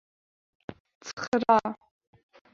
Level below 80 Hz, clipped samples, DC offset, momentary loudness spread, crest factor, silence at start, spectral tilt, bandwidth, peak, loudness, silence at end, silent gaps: -68 dBFS; under 0.1%; under 0.1%; 23 LU; 24 dB; 0.7 s; -4.5 dB/octave; 7.6 kHz; -8 dBFS; -26 LUFS; 0.8 s; 0.80-0.85 s, 0.95-1.01 s, 1.13-1.17 s, 1.28-1.32 s